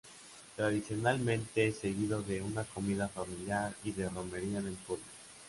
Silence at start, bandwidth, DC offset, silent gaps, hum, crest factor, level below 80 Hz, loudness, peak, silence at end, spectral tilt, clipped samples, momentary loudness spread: 0.05 s; 11.5 kHz; under 0.1%; none; none; 18 dB; -60 dBFS; -36 LUFS; -18 dBFS; 0 s; -5.5 dB/octave; under 0.1%; 10 LU